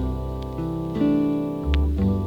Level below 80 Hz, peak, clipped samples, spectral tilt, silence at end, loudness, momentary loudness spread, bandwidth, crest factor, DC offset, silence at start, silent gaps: -28 dBFS; -8 dBFS; under 0.1%; -9 dB/octave; 0 s; -24 LUFS; 8 LU; 6.6 kHz; 14 dB; under 0.1%; 0 s; none